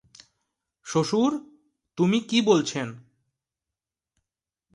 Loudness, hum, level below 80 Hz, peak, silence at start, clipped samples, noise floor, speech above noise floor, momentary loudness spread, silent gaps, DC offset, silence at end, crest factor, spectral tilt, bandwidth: -24 LUFS; none; -70 dBFS; -8 dBFS; 0.85 s; under 0.1%; -89 dBFS; 66 dB; 15 LU; none; under 0.1%; 1.75 s; 20 dB; -5 dB/octave; 11.5 kHz